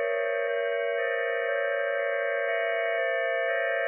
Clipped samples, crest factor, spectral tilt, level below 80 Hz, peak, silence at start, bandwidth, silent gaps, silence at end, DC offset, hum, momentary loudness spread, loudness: under 0.1%; 12 dB; 12.5 dB/octave; under -90 dBFS; -16 dBFS; 0 s; 3.1 kHz; none; 0 s; under 0.1%; none; 1 LU; -27 LUFS